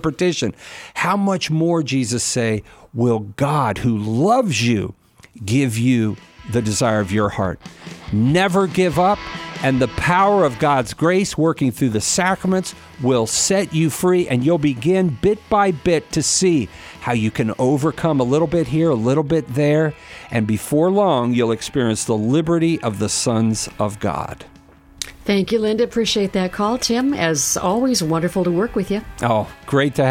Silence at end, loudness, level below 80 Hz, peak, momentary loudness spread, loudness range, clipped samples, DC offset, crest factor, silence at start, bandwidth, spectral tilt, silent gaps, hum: 0 s; -18 LUFS; -44 dBFS; -4 dBFS; 8 LU; 3 LU; under 0.1%; under 0.1%; 16 dB; 0.05 s; 16.5 kHz; -5 dB/octave; none; none